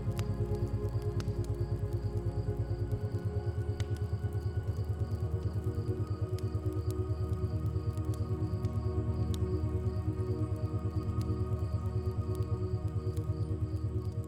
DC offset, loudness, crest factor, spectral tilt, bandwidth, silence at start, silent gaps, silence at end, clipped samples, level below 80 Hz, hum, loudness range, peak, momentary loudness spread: under 0.1%; -35 LUFS; 12 dB; -8.5 dB/octave; 12.5 kHz; 0 s; none; 0 s; under 0.1%; -42 dBFS; none; 1 LU; -20 dBFS; 2 LU